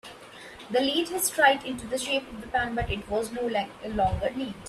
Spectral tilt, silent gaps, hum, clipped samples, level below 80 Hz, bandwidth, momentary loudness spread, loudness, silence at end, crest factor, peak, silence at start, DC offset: -3 dB/octave; none; none; under 0.1%; -46 dBFS; 15.5 kHz; 11 LU; -27 LUFS; 0 s; 22 dB; -6 dBFS; 0.05 s; under 0.1%